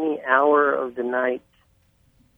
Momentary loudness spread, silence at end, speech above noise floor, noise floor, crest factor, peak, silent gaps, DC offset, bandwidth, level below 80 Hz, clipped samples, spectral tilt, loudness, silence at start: 9 LU; 1 s; 41 dB; -61 dBFS; 20 dB; -2 dBFS; none; under 0.1%; 3.7 kHz; -66 dBFS; under 0.1%; -6.5 dB/octave; -21 LUFS; 0 s